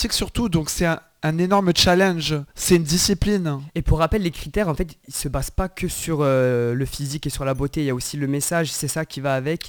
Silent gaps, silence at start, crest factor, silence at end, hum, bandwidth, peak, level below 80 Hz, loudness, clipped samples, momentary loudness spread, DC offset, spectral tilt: none; 0 s; 16 dB; 0 s; none; over 20 kHz; -4 dBFS; -34 dBFS; -21 LUFS; under 0.1%; 9 LU; under 0.1%; -4.5 dB/octave